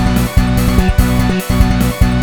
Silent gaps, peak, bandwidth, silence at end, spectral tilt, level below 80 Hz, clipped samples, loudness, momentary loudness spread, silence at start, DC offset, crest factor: none; 0 dBFS; 18 kHz; 0 s; -6 dB/octave; -16 dBFS; 0.6%; -13 LUFS; 1 LU; 0 s; 2%; 12 dB